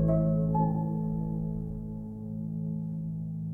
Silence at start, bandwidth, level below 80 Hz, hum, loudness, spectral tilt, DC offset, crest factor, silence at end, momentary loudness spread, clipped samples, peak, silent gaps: 0 s; 1.8 kHz; -44 dBFS; none; -32 LUFS; -13.5 dB/octave; under 0.1%; 14 dB; 0 s; 11 LU; under 0.1%; -16 dBFS; none